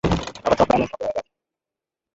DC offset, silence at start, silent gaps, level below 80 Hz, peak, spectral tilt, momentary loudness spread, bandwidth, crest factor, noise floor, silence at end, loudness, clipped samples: under 0.1%; 0.05 s; none; -40 dBFS; -4 dBFS; -6 dB/octave; 10 LU; 8 kHz; 20 dB; -88 dBFS; 0.95 s; -22 LUFS; under 0.1%